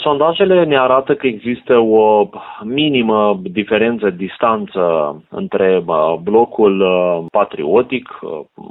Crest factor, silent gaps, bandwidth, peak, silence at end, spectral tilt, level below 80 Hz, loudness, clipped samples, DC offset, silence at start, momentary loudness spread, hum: 14 dB; none; 4.1 kHz; 0 dBFS; 0.1 s; -10 dB/octave; -54 dBFS; -14 LUFS; under 0.1%; under 0.1%; 0 s; 10 LU; none